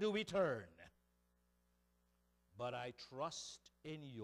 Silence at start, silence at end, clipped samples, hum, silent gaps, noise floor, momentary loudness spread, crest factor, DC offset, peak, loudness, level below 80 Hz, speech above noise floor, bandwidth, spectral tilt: 0 s; 0 s; under 0.1%; 60 Hz at -75 dBFS; none; -80 dBFS; 16 LU; 18 dB; under 0.1%; -28 dBFS; -45 LUFS; -78 dBFS; 36 dB; 15 kHz; -4.5 dB/octave